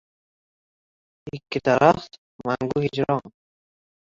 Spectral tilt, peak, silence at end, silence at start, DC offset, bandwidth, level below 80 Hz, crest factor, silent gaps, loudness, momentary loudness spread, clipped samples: -6.5 dB/octave; -2 dBFS; 0.9 s; 1.25 s; under 0.1%; 7.6 kHz; -58 dBFS; 24 dB; 2.18-2.39 s; -22 LUFS; 20 LU; under 0.1%